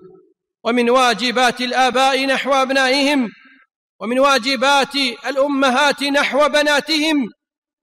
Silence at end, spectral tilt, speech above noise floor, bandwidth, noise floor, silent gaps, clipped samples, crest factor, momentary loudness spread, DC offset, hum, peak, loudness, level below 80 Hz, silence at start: 0.55 s; -2 dB/octave; 37 dB; 16 kHz; -53 dBFS; 3.76-3.99 s; under 0.1%; 12 dB; 6 LU; under 0.1%; none; -6 dBFS; -16 LUFS; -58 dBFS; 0.05 s